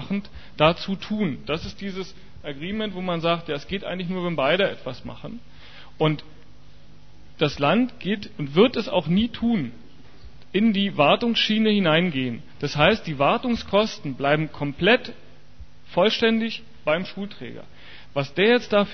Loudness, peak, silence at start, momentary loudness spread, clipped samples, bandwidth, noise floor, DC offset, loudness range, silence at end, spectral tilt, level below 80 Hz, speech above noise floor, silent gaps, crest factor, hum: -23 LUFS; -2 dBFS; 0 s; 15 LU; under 0.1%; 6.6 kHz; -50 dBFS; 1%; 6 LU; 0 s; -6.5 dB/octave; -50 dBFS; 28 dB; none; 22 dB; none